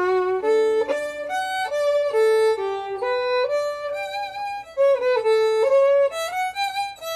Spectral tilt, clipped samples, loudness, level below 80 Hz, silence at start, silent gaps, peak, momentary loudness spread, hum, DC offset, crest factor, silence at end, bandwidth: -2.5 dB/octave; under 0.1%; -22 LUFS; -62 dBFS; 0 s; none; -10 dBFS; 10 LU; none; under 0.1%; 12 dB; 0 s; 14 kHz